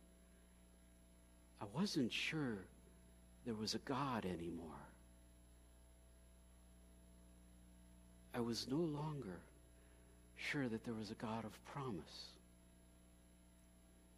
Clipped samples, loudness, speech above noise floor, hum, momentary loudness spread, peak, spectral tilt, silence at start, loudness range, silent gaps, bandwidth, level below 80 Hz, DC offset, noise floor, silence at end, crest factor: under 0.1%; -46 LUFS; 23 dB; 60 Hz at -65 dBFS; 26 LU; -28 dBFS; -5 dB/octave; 0 s; 12 LU; none; 15.5 kHz; -68 dBFS; under 0.1%; -67 dBFS; 0 s; 20 dB